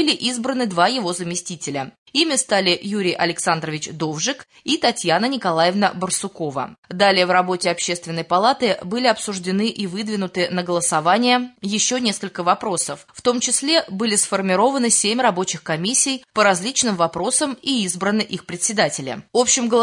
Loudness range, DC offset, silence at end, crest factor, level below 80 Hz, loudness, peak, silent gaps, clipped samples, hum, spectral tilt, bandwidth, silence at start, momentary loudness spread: 3 LU; under 0.1%; 0 s; 18 dB; -64 dBFS; -19 LUFS; -2 dBFS; 1.98-2.06 s, 6.78-6.83 s; under 0.1%; none; -2.5 dB/octave; 11.5 kHz; 0 s; 9 LU